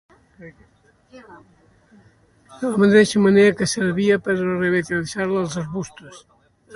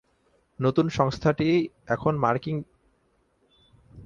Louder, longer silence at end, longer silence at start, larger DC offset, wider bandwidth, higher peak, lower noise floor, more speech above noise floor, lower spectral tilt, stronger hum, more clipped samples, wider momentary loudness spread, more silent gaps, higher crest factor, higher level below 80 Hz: first, -19 LUFS vs -25 LUFS; about the same, 0 s vs 0 s; second, 0.4 s vs 0.6 s; neither; first, 11.5 kHz vs 7.4 kHz; about the same, -4 dBFS vs -6 dBFS; second, -55 dBFS vs -68 dBFS; second, 35 dB vs 43 dB; second, -5.5 dB/octave vs -7.5 dB/octave; neither; neither; first, 14 LU vs 6 LU; neither; about the same, 18 dB vs 20 dB; about the same, -56 dBFS vs -54 dBFS